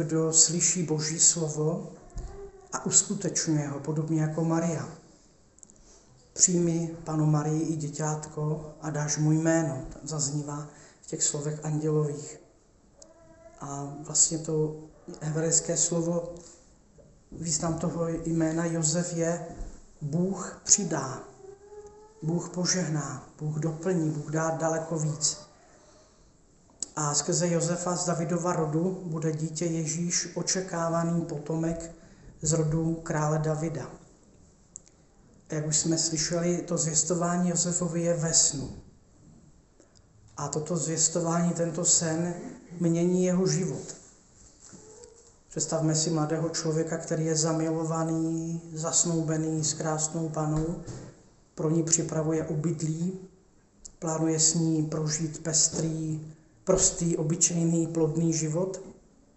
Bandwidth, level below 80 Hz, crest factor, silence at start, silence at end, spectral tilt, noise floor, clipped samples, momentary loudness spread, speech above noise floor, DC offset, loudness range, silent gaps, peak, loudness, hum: 8.4 kHz; -54 dBFS; 26 dB; 0 s; 0.45 s; -4 dB/octave; -60 dBFS; under 0.1%; 16 LU; 32 dB; under 0.1%; 5 LU; none; -4 dBFS; -27 LUFS; none